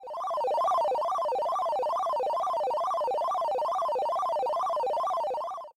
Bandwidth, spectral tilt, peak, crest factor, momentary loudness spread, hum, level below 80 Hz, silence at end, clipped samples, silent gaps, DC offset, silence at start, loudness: 16 kHz; -2.5 dB/octave; -20 dBFS; 8 dB; 3 LU; none; -72 dBFS; 0.05 s; under 0.1%; none; under 0.1%; 0 s; -29 LUFS